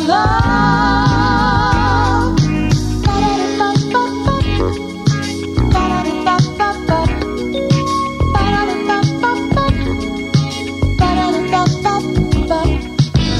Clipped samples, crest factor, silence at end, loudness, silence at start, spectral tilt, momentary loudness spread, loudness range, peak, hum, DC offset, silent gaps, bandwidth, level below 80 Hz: under 0.1%; 14 dB; 0 s; -15 LUFS; 0 s; -6 dB/octave; 5 LU; 2 LU; 0 dBFS; none; under 0.1%; none; 12 kHz; -24 dBFS